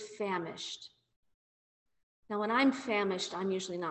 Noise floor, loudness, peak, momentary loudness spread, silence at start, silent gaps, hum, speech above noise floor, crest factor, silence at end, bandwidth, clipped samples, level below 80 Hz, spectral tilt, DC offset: under -90 dBFS; -33 LUFS; -18 dBFS; 13 LU; 0 s; 1.16-1.23 s, 1.34-1.86 s, 2.03-2.23 s; none; over 57 dB; 18 dB; 0 s; 8.4 kHz; under 0.1%; -78 dBFS; -4 dB/octave; under 0.1%